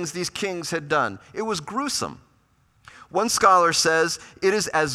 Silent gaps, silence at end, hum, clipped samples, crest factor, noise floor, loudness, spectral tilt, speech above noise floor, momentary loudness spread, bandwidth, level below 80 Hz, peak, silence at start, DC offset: none; 0 s; none; under 0.1%; 20 dB; -62 dBFS; -22 LUFS; -2.5 dB/octave; 39 dB; 12 LU; 16 kHz; -60 dBFS; -4 dBFS; 0 s; under 0.1%